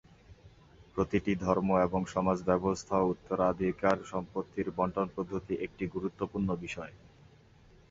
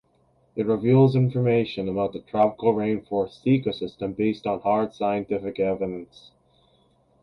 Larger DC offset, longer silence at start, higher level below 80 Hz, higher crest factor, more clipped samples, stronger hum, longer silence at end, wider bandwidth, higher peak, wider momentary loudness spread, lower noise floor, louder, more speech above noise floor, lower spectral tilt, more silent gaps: neither; second, 0.3 s vs 0.55 s; about the same, -54 dBFS vs -58 dBFS; about the same, 22 dB vs 18 dB; neither; neither; second, 0.95 s vs 1.2 s; first, 7.8 kHz vs 6.2 kHz; second, -10 dBFS vs -6 dBFS; about the same, 9 LU vs 10 LU; second, -59 dBFS vs -64 dBFS; second, -32 LUFS vs -24 LUFS; second, 28 dB vs 40 dB; second, -7 dB/octave vs -9.5 dB/octave; neither